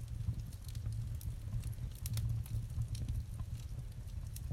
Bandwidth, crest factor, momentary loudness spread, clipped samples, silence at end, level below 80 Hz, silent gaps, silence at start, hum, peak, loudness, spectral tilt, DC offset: 16.5 kHz; 16 dB; 7 LU; under 0.1%; 0 s; -44 dBFS; none; 0 s; none; -24 dBFS; -43 LUFS; -6 dB/octave; under 0.1%